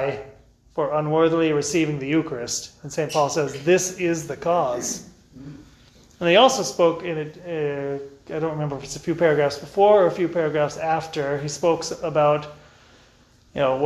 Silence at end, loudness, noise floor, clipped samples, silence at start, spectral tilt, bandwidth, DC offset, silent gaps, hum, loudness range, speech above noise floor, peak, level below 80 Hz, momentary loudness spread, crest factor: 0 s; -22 LUFS; -55 dBFS; under 0.1%; 0 s; -4.5 dB/octave; 13.5 kHz; under 0.1%; none; none; 3 LU; 33 dB; -4 dBFS; -56 dBFS; 13 LU; 18 dB